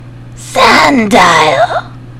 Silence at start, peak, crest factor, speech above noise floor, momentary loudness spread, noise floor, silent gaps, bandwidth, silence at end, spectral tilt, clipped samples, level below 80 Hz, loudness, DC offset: 0 s; 0 dBFS; 10 dB; 20 dB; 10 LU; -28 dBFS; none; over 20 kHz; 0 s; -3.5 dB/octave; 4%; -36 dBFS; -7 LUFS; under 0.1%